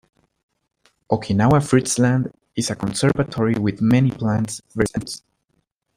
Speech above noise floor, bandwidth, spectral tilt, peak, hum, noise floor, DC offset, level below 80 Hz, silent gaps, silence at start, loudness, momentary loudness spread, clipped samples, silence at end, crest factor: 51 dB; 15.5 kHz; -6 dB/octave; -2 dBFS; none; -70 dBFS; under 0.1%; -48 dBFS; none; 1.1 s; -20 LUFS; 10 LU; under 0.1%; 0.8 s; 18 dB